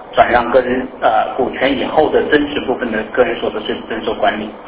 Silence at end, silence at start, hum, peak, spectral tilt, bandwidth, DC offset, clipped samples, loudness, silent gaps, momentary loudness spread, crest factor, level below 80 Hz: 0 s; 0 s; none; 0 dBFS; -8.5 dB/octave; 4 kHz; under 0.1%; under 0.1%; -15 LUFS; none; 8 LU; 16 dB; -42 dBFS